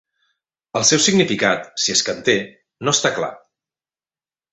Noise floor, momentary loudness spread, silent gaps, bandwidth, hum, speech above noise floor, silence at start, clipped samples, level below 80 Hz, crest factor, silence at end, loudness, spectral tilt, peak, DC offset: under -90 dBFS; 12 LU; none; 8.4 kHz; none; over 72 dB; 0.75 s; under 0.1%; -60 dBFS; 20 dB; 1.15 s; -17 LUFS; -2.5 dB/octave; -2 dBFS; under 0.1%